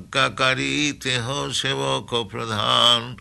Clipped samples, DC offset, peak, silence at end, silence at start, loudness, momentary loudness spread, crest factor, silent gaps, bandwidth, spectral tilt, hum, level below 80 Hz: under 0.1%; under 0.1%; -4 dBFS; 0 s; 0 s; -20 LUFS; 9 LU; 18 dB; none; 12 kHz; -3 dB/octave; none; -52 dBFS